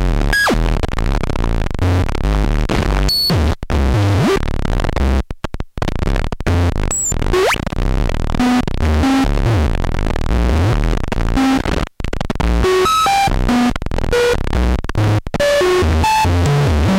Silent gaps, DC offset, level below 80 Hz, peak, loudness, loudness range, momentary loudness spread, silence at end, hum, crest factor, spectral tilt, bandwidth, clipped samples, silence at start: none; under 0.1%; -18 dBFS; -4 dBFS; -16 LUFS; 3 LU; 7 LU; 0 s; none; 10 dB; -5 dB/octave; 16.5 kHz; under 0.1%; 0 s